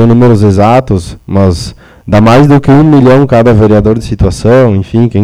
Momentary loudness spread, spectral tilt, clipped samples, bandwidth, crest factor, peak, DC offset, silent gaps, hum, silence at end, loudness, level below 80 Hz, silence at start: 8 LU; -8 dB/octave; 6%; 11.5 kHz; 6 dB; 0 dBFS; under 0.1%; none; none; 0 s; -6 LUFS; -26 dBFS; 0 s